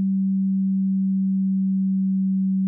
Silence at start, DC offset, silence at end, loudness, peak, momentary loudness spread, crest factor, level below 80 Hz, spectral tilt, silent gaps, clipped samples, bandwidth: 0 s; under 0.1%; 0 s; -22 LUFS; -18 dBFS; 0 LU; 4 dB; under -90 dBFS; -29 dB/octave; none; under 0.1%; 0.3 kHz